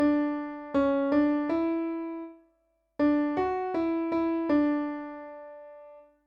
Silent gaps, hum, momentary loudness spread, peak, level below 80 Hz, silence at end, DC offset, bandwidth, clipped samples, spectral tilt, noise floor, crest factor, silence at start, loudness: none; none; 19 LU; -16 dBFS; -60 dBFS; 0.25 s; under 0.1%; 5.2 kHz; under 0.1%; -8 dB/octave; -72 dBFS; 14 dB; 0 s; -28 LUFS